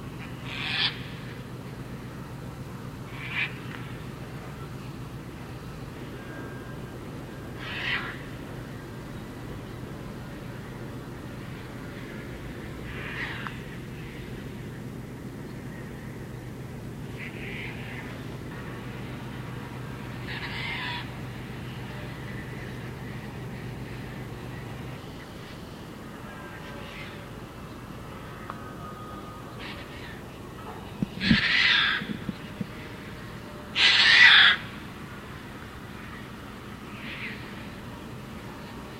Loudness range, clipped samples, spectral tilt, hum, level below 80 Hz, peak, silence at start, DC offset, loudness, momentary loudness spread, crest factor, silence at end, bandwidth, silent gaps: 20 LU; under 0.1%; -4 dB/octave; none; -50 dBFS; -2 dBFS; 0 s; under 0.1%; -28 LUFS; 15 LU; 28 dB; 0 s; 16 kHz; none